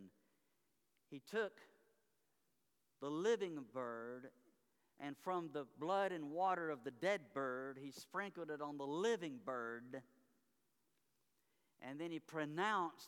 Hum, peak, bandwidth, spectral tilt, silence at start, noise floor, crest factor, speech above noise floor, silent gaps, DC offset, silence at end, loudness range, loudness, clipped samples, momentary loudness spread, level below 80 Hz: none; -26 dBFS; 18 kHz; -5 dB/octave; 0 s; -86 dBFS; 20 dB; 42 dB; none; under 0.1%; 0 s; 6 LU; -44 LUFS; under 0.1%; 14 LU; under -90 dBFS